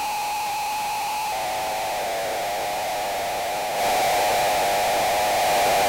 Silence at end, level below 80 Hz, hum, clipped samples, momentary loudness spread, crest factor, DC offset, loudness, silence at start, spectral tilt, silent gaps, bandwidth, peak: 0 s; -52 dBFS; none; under 0.1%; 5 LU; 10 dB; under 0.1%; -23 LUFS; 0 s; -1.5 dB/octave; none; 16 kHz; -14 dBFS